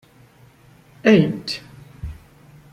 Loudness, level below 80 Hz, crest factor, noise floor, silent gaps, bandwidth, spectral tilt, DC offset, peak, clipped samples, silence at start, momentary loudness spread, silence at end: -19 LUFS; -46 dBFS; 20 dB; -50 dBFS; none; 12 kHz; -6.5 dB/octave; under 0.1%; -4 dBFS; under 0.1%; 1.05 s; 21 LU; 0.6 s